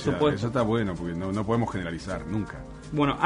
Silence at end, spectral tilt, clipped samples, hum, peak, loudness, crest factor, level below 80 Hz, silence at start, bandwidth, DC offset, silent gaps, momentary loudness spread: 0 s; -7 dB/octave; under 0.1%; none; -8 dBFS; -28 LUFS; 20 dB; -46 dBFS; 0 s; 10.5 kHz; under 0.1%; none; 9 LU